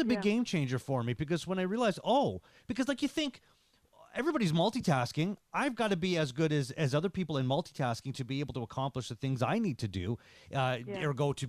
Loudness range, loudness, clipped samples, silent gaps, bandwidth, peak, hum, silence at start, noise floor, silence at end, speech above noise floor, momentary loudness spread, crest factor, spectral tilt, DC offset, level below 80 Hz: 3 LU; -33 LUFS; under 0.1%; none; 14 kHz; -18 dBFS; none; 0 s; -64 dBFS; 0 s; 32 dB; 8 LU; 16 dB; -6 dB/octave; under 0.1%; -62 dBFS